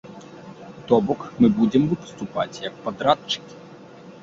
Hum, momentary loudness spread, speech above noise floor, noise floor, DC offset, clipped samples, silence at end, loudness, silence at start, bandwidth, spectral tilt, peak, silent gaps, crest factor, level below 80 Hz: none; 22 LU; 22 dB; -43 dBFS; under 0.1%; under 0.1%; 0.1 s; -22 LUFS; 0.05 s; 7.6 kHz; -6.5 dB/octave; -4 dBFS; none; 20 dB; -56 dBFS